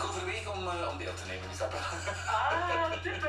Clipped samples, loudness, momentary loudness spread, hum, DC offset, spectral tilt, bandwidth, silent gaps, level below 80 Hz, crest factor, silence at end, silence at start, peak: under 0.1%; -33 LUFS; 8 LU; none; under 0.1%; -4 dB/octave; 13.5 kHz; none; -52 dBFS; 16 dB; 0 s; 0 s; -18 dBFS